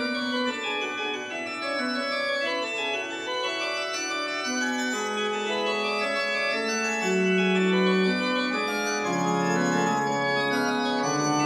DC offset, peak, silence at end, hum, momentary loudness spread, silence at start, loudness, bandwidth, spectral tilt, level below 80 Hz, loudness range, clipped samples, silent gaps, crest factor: under 0.1%; -10 dBFS; 0 s; none; 6 LU; 0 s; -26 LUFS; 14.5 kHz; -4 dB/octave; -80 dBFS; 4 LU; under 0.1%; none; 16 dB